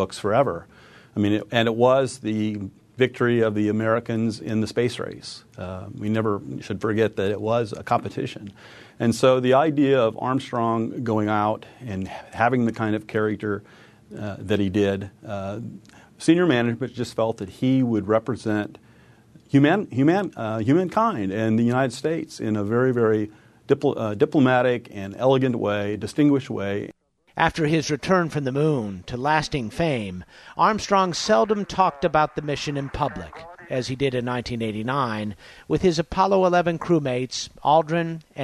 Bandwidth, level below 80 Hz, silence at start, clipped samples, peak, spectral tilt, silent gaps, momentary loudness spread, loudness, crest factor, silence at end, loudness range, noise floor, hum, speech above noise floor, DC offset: 13 kHz; -52 dBFS; 0 s; under 0.1%; -2 dBFS; -6.5 dB/octave; none; 13 LU; -23 LUFS; 20 dB; 0 s; 4 LU; -52 dBFS; none; 30 dB; under 0.1%